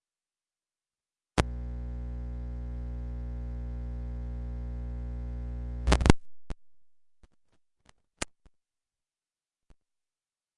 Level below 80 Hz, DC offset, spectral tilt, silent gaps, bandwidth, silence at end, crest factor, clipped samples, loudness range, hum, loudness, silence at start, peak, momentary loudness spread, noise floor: -36 dBFS; under 0.1%; -5.5 dB/octave; none; 11 kHz; 2.3 s; 32 dB; under 0.1%; 16 LU; none; -34 LUFS; 1.35 s; -2 dBFS; 14 LU; under -90 dBFS